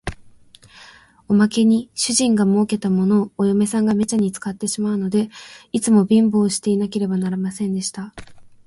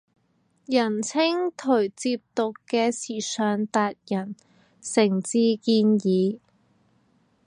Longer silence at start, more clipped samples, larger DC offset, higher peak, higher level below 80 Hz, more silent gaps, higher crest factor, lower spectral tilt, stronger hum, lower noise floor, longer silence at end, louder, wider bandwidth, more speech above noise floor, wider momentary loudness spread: second, 0.05 s vs 0.7 s; neither; neither; about the same, -4 dBFS vs -6 dBFS; first, -50 dBFS vs -76 dBFS; neither; about the same, 16 dB vs 18 dB; about the same, -5.5 dB/octave vs -5 dB/octave; neither; second, -47 dBFS vs -67 dBFS; second, 0.2 s vs 1.1 s; first, -19 LUFS vs -24 LUFS; about the same, 11.5 kHz vs 11 kHz; second, 29 dB vs 44 dB; about the same, 10 LU vs 9 LU